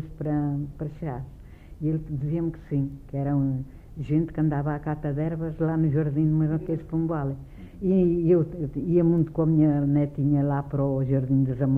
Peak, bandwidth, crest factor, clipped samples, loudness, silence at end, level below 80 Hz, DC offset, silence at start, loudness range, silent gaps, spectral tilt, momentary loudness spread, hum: -10 dBFS; 3.2 kHz; 14 dB; under 0.1%; -25 LUFS; 0 s; -44 dBFS; under 0.1%; 0 s; 6 LU; none; -12 dB/octave; 11 LU; none